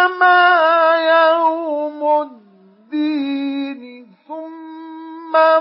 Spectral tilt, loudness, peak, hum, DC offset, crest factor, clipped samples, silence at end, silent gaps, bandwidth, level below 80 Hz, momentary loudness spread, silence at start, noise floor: -7 dB/octave; -15 LUFS; -2 dBFS; none; under 0.1%; 14 dB; under 0.1%; 0 s; none; 5.8 kHz; -88 dBFS; 22 LU; 0 s; -48 dBFS